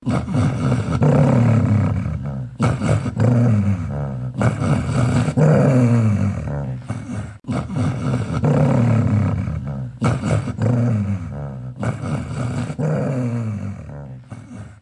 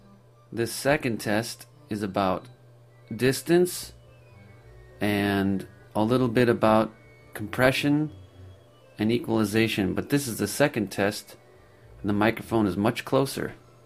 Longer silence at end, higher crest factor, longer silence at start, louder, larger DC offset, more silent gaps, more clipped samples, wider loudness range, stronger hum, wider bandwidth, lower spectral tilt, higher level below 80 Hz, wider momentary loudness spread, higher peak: second, 0.05 s vs 0.3 s; about the same, 16 dB vs 20 dB; second, 0 s vs 0.5 s; first, -20 LUFS vs -26 LUFS; neither; neither; neither; about the same, 5 LU vs 4 LU; neither; second, 11 kHz vs 15.5 kHz; first, -8.5 dB/octave vs -5.5 dB/octave; first, -40 dBFS vs -56 dBFS; about the same, 13 LU vs 13 LU; first, -2 dBFS vs -6 dBFS